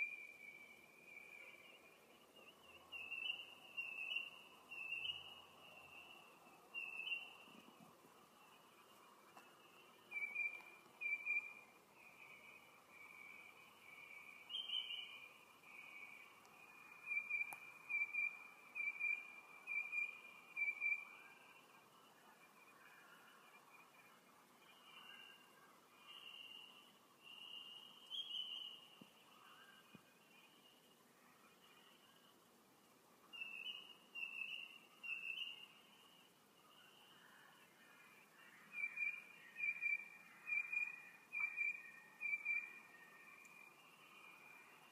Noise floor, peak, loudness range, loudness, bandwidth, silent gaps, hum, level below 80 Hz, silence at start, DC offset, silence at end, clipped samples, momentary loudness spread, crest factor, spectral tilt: -71 dBFS; -32 dBFS; 19 LU; -46 LUFS; 15.5 kHz; none; none; under -90 dBFS; 0 s; under 0.1%; 0 s; under 0.1%; 24 LU; 20 dB; -0.5 dB/octave